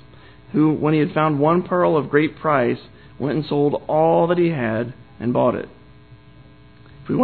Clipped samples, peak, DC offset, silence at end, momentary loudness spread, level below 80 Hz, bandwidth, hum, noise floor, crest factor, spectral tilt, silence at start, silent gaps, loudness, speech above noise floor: under 0.1%; -4 dBFS; 0.2%; 0 s; 10 LU; -54 dBFS; 4.5 kHz; none; -47 dBFS; 16 dB; -11.5 dB/octave; 0.5 s; none; -20 LUFS; 28 dB